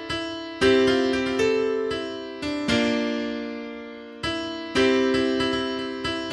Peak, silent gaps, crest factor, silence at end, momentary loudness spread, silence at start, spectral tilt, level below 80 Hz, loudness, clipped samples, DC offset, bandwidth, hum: -8 dBFS; none; 16 dB; 0 s; 12 LU; 0 s; -4.5 dB/octave; -50 dBFS; -24 LUFS; under 0.1%; under 0.1%; 11.5 kHz; none